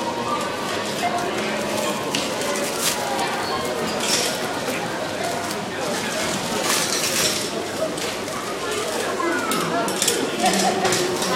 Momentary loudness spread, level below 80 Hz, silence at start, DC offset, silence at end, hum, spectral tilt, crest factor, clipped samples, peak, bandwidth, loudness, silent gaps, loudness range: 6 LU; -56 dBFS; 0 s; under 0.1%; 0 s; none; -2.5 dB/octave; 20 dB; under 0.1%; -2 dBFS; 16.5 kHz; -22 LUFS; none; 1 LU